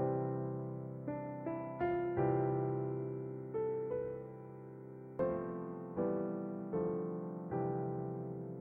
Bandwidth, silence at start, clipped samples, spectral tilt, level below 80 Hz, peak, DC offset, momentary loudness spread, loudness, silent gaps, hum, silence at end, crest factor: 3.3 kHz; 0 s; under 0.1%; -12 dB/octave; -68 dBFS; -22 dBFS; under 0.1%; 9 LU; -39 LUFS; none; none; 0 s; 16 dB